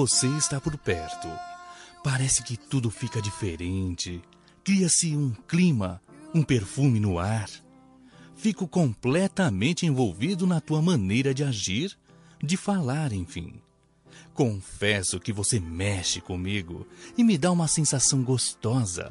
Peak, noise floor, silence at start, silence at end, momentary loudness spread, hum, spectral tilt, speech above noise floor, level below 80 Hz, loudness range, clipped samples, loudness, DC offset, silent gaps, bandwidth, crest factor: -8 dBFS; -58 dBFS; 0 s; 0 s; 13 LU; none; -4.5 dB/octave; 32 dB; -54 dBFS; 4 LU; under 0.1%; -26 LUFS; under 0.1%; none; 11.5 kHz; 18 dB